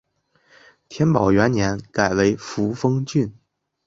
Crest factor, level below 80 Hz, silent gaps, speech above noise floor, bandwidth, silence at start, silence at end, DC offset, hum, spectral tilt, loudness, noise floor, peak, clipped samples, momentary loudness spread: 20 dB; -46 dBFS; none; 42 dB; 7.8 kHz; 0.9 s; 0.55 s; under 0.1%; none; -6.5 dB/octave; -20 LUFS; -61 dBFS; -2 dBFS; under 0.1%; 8 LU